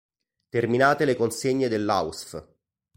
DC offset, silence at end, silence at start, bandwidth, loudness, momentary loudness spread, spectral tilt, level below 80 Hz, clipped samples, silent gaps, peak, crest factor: under 0.1%; 0.55 s; 0.55 s; 16.5 kHz; -24 LUFS; 16 LU; -5 dB/octave; -60 dBFS; under 0.1%; none; -6 dBFS; 20 dB